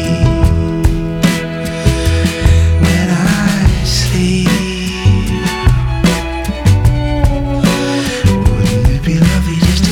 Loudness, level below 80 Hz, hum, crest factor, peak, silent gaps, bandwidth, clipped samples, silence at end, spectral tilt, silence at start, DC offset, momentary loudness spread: -13 LUFS; -18 dBFS; none; 12 dB; 0 dBFS; none; 17 kHz; under 0.1%; 0 s; -5.5 dB/octave; 0 s; under 0.1%; 4 LU